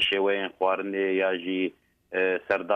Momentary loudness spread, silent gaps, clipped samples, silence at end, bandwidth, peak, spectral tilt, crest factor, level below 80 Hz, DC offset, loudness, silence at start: 5 LU; none; under 0.1%; 0 s; 9.4 kHz; -10 dBFS; -5 dB/octave; 16 dB; -68 dBFS; under 0.1%; -27 LUFS; 0 s